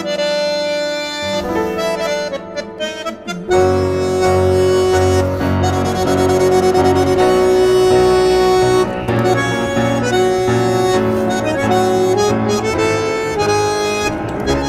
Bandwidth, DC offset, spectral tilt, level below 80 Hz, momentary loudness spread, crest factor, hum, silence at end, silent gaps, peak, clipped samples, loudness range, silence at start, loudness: 14.5 kHz; under 0.1%; -5.5 dB/octave; -38 dBFS; 7 LU; 12 dB; none; 0 s; none; -4 dBFS; under 0.1%; 6 LU; 0 s; -15 LUFS